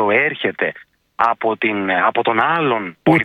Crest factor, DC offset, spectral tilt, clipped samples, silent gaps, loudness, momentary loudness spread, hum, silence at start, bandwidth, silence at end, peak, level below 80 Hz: 16 dB; under 0.1%; -7.5 dB/octave; under 0.1%; none; -17 LUFS; 4 LU; none; 0 s; 11 kHz; 0 s; 0 dBFS; -58 dBFS